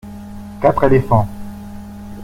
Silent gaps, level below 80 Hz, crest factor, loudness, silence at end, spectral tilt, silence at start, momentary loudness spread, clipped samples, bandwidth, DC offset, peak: none; -36 dBFS; 18 dB; -15 LUFS; 0 s; -9 dB/octave; 0.05 s; 20 LU; under 0.1%; 16 kHz; under 0.1%; 0 dBFS